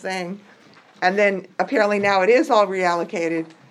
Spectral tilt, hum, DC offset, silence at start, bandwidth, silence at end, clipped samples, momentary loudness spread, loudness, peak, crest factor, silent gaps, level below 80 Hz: -5 dB/octave; none; under 0.1%; 0.05 s; 12.5 kHz; 0.2 s; under 0.1%; 12 LU; -20 LUFS; -4 dBFS; 18 dB; none; -82 dBFS